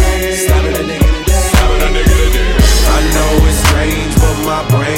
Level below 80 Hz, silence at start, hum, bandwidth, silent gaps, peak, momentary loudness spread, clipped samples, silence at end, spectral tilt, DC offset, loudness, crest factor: -12 dBFS; 0 s; none; 17 kHz; none; 0 dBFS; 3 LU; under 0.1%; 0 s; -4.5 dB/octave; under 0.1%; -12 LUFS; 10 dB